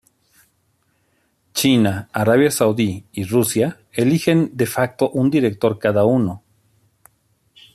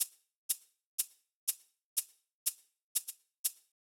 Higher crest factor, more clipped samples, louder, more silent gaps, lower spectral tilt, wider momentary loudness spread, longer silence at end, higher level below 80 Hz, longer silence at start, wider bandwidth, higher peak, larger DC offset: second, 16 dB vs 24 dB; neither; first, -18 LUFS vs -38 LUFS; second, none vs 0.36-0.49 s, 0.86-0.98 s, 1.34-1.47 s, 1.83-1.96 s, 2.33-2.46 s, 2.83-2.95 s, 3.38-3.44 s; first, -5.5 dB/octave vs 6.5 dB/octave; second, 7 LU vs 10 LU; first, 1.35 s vs 0.4 s; first, -58 dBFS vs under -90 dBFS; first, 1.55 s vs 0 s; second, 14.5 kHz vs 19 kHz; first, -2 dBFS vs -18 dBFS; neither